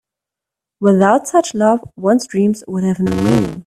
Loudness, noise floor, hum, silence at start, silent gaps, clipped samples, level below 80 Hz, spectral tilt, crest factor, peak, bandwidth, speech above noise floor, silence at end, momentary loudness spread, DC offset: -15 LUFS; -85 dBFS; none; 0.8 s; none; under 0.1%; -46 dBFS; -6.5 dB/octave; 16 dB; 0 dBFS; 13.5 kHz; 71 dB; 0.05 s; 6 LU; under 0.1%